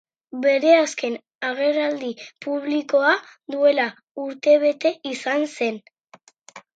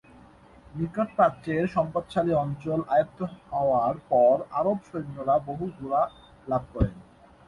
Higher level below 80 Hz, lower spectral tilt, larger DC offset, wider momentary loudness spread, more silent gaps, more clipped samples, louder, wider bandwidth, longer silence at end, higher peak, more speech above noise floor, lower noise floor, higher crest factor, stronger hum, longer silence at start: second, -82 dBFS vs -46 dBFS; second, -3 dB/octave vs -9 dB/octave; neither; first, 15 LU vs 11 LU; first, 1.35-1.39 s, 4.11-4.15 s vs none; neither; first, -21 LUFS vs -26 LUFS; second, 9.2 kHz vs 11 kHz; second, 0.15 s vs 0.45 s; first, -4 dBFS vs -8 dBFS; first, 32 dB vs 27 dB; about the same, -53 dBFS vs -52 dBFS; about the same, 18 dB vs 18 dB; neither; second, 0.35 s vs 0.75 s